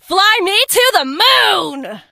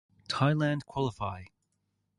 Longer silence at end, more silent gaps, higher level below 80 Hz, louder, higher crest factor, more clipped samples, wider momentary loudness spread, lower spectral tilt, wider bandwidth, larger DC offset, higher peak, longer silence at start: second, 0.1 s vs 0.7 s; neither; about the same, -58 dBFS vs -58 dBFS; first, -11 LUFS vs -31 LUFS; second, 14 dB vs 20 dB; neither; about the same, 10 LU vs 11 LU; second, 0 dB/octave vs -6.5 dB/octave; first, 16.5 kHz vs 11 kHz; neither; first, 0 dBFS vs -12 dBFS; second, 0.1 s vs 0.3 s